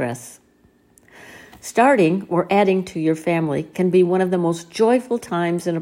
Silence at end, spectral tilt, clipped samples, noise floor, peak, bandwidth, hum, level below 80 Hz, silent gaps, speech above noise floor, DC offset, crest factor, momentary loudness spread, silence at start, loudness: 0 s; -6.5 dB/octave; under 0.1%; -56 dBFS; -4 dBFS; 15.5 kHz; none; -62 dBFS; none; 38 dB; under 0.1%; 16 dB; 8 LU; 0 s; -19 LUFS